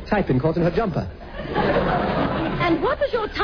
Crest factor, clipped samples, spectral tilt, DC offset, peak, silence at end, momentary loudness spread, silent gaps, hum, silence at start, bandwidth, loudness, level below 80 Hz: 14 dB; under 0.1%; -8.5 dB/octave; under 0.1%; -8 dBFS; 0 s; 7 LU; none; none; 0 s; 5.4 kHz; -22 LUFS; -36 dBFS